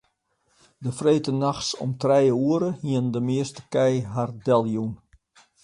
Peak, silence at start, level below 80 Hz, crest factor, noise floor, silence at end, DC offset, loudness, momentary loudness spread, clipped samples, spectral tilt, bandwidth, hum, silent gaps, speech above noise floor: -6 dBFS; 0.8 s; -60 dBFS; 18 dB; -70 dBFS; 0.7 s; under 0.1%; -24 LUFS; 9 LU; under 0.1%; -6.5 dB/octave; 11.5 kHz; none; none; 47 dB